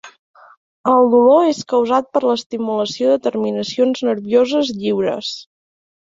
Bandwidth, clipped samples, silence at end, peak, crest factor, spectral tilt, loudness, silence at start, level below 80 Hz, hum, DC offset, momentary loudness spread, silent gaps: 7.8 kHz; under 0.1%; 0.6 s; -2 dBFS; 16 dB; -5 dB/octave; -16 LUFS; 0.05 s; -62 dBFS; none; under 0.1%; 10 LU; 0.19-0.34 s, 0.57-0.84 s, 2.46-2.50 s